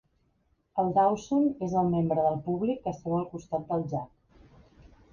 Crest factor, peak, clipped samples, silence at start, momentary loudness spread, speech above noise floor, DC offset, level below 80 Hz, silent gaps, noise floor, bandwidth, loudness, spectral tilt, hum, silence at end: 18 dB; -12 dBFS; under 0.1%; 0.75 s; 10 LU; 44 dB; under 0.1%; -58 dBFS; none; -71 dBFS; 7.2 kHz; -29 LUFS; -8.5 dB/octave; none; 1.05 s